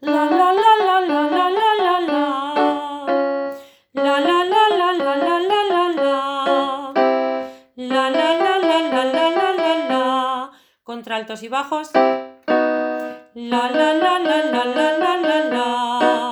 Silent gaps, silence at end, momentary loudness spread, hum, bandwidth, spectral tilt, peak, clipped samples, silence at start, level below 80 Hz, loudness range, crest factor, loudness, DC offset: none; 0 s; 11 LU; none; over 20 kHz; -3.5 dB/octave; -2 dBFS; under 0.1%; 0 s; -68 dBFS; 3 LU; 16 dB; -18 LUFS; under 0.1%